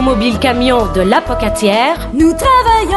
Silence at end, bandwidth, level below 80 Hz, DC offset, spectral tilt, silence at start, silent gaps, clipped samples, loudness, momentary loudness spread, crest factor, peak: 0 s; 12 kHz; -24 dBFS; under 0.1%; -5 dB/octave; 0 s; none; under 0.1%; -12 LUFS; 4 LU; 10 dB; 0 dBFS